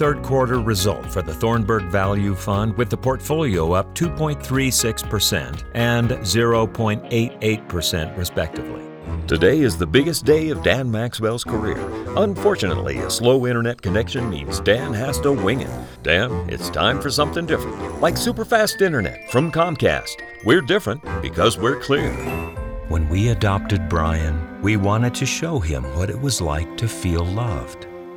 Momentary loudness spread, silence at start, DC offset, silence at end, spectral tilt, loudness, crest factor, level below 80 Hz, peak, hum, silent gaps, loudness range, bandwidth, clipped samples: 8 LU; 0 s; under 0.1%; 0 s; -5 dB/octave; -20 LUFS; 18 dB; -34 dBFS; -2 dBFS; none; none; 2 LU; over 20 kHz; under 0.1%